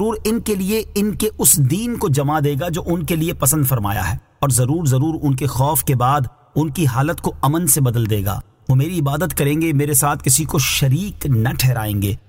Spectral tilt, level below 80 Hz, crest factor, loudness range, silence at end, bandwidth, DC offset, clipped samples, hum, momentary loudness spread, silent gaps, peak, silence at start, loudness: -5 dB/octave; -36 dBFS; 18 dB; 1 LU; 0.1 s; 16.5 kHz; under 0.1%; under 0.1%; none; 6 LU; none; 0 dBFS; 0 s; -17 LUFS